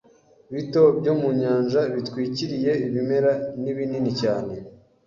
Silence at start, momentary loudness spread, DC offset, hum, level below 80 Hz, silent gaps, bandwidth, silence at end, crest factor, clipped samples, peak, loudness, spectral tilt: 0.5 s; 10 LU; under 0.1%; none; -60 dBFS; none; 7.4 kHz; 0.3 s; 18 dB; under 0.1%; -4 dBFS; -23 LUFS; -7.5 dB/octave